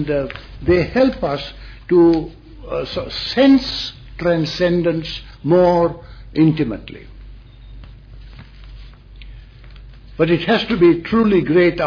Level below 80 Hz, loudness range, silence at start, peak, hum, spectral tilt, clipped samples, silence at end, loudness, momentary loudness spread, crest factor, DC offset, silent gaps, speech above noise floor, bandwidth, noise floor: -38 dBFS; 7 LU; 0 s; -4 dBFS; none; -7.5 dB/octave; under 0.1%; 0 s; -17 LUFS; 15 LU; 14 dB; under 0.1%; none; 23 dB; 5.4 kHz; -38 dBFS